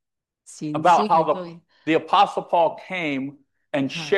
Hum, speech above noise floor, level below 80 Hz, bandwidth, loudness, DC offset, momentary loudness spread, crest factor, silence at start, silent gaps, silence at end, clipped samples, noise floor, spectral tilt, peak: none; 35 dB; -74 dBFS; 11.5 kHz; -21 LUFS; under 0.1%; 14 LU; 16 dB; 0.5 s; none; 0 s; under 0.1%; -55 dBFS; -5 dB/octave; -6 dBFS